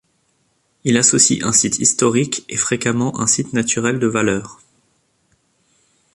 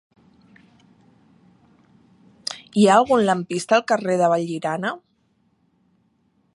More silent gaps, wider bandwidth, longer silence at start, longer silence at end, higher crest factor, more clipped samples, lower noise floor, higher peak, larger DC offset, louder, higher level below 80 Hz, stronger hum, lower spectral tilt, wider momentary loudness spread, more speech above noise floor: neither; about the same, 11.5 kHz vs 11.5 kHz; second, 0.85 s vs 2.5 s; about the same, 1.6 s vs 1.55 s; about the same, 20 dB vs 22 dB; neither; about the same, -64 dBFS vs -65 dBFS; about the same, 0 dBFS vs -2 dBFS; neither; first, -16 LUFS vs -20 LUFS; first, -52 dBFS vs -68 dBFS; neither; second, -3 dB/octave vs -5 dB/octave; second, 8 LU vs 17 LU; about the same, 47 dB vs 46 dB